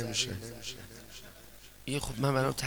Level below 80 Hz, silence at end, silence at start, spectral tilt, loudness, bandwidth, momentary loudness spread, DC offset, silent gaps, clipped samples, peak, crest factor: -52 dBFS; 0 s; 0 s; -4 dB/octave; -34 LUFS; over 20 kHz; 21 LU; 0.2%; none; under 0.1%; -14 dBFS; 20 dB